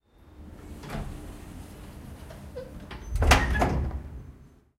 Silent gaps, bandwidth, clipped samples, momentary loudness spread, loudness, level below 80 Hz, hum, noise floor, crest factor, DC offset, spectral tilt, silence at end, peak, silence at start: none; 16 kHz; under 0.1%; 24 LU; -27 LUFS; -34 dBFS; none; -51 dBFS; 26 dB; under 0.1%; -4.5 dB/octave; 0.3 s; -4 dBFS; 0.25 s